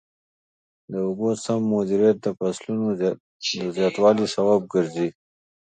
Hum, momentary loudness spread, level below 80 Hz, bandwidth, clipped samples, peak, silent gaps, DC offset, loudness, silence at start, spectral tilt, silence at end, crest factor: none; 9 LU; -64 dBFS; 9.4 kHz; under 0.1%; -6 dBFS; 3.20-3.40 s; under 0.1%; -23 LUFS; 0.9 s; -5.5 dB/octave; 0.55 s; 18 dB